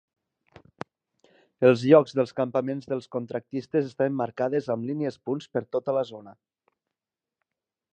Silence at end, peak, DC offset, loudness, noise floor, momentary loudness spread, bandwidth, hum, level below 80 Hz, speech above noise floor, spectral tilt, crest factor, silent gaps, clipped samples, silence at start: 1.6 s; -4 dBFS; under 0.1%; -26 LUFS; -90 dBFS; 16 LU; 8.8 kHz; none; -72 dBFS; 65 dB; -7.5 dB/octave; 24 dB; none; under 0.1%; 1.6 s